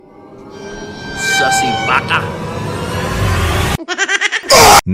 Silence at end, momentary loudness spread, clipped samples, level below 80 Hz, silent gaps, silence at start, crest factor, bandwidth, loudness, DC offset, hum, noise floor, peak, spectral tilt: 0 s; 20 LU; under 0.1%; -30 dBFS; none; 0.2 s; 14 dB; 17 kHz; -12 LUFS; under 0.1%; none; -36 dBFS; 0 dBFS; -3 dB/octave